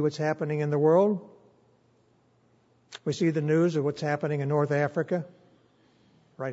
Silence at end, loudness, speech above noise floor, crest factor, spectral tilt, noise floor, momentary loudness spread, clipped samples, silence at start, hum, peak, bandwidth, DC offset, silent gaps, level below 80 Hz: 0 s; -27 LUFS; 39 dB; 18 dB; -7.5 dB/octave; -65 dBFS; 12 LU; under 0.1%; 0 s; none; -10 dBFS; 8 kHz; under 0.1%; none; -76 dBFS